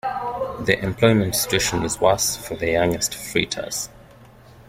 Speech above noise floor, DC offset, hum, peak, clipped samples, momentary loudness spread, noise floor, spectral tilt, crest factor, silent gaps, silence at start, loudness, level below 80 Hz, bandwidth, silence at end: 26 dB; under 0.1%; none; -2 dBFS; under 0.1%; 9 LU; -47 dBFS; -3.5 dB/octave; 20 dB; none; 0.05 s; -21 LUFS; -46 dBFS; 16.5 kHz; 0.05 s